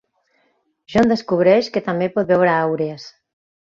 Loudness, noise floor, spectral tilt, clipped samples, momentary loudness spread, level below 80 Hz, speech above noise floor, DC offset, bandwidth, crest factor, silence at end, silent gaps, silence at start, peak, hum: -18 LUFS; -65 dBFS; -7 dB/octave; under 0.1%; 9 LU; -54 dBFS; 48 dB; under 0.1%; 7.6 kHz; 18 dB; 0.55 s; none; 0.9 s; -2 dBFS; none